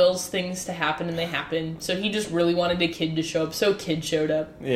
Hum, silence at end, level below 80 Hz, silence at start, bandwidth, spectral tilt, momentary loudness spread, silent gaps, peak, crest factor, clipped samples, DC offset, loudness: none; 0 s; -54 dBFS; 0 s; 15.5 kHz; -4.5 dB/octave; 6 LU; none; -8 dBFS; 16 dB; under 0.1%; under 0.1%; -25 LUFS